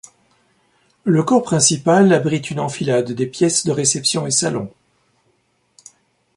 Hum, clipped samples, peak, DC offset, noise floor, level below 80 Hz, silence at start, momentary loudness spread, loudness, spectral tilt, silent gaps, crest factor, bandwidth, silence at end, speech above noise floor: none; under 0.1%; 0 dBFS; under 0.1%; -64 dBFS; -58 dBFS; 1.05 s; 10 LU; -17 LUFS; -4 dB/octave; none; 18 dB; 11.5 kHz; 1.7 s; 47 dB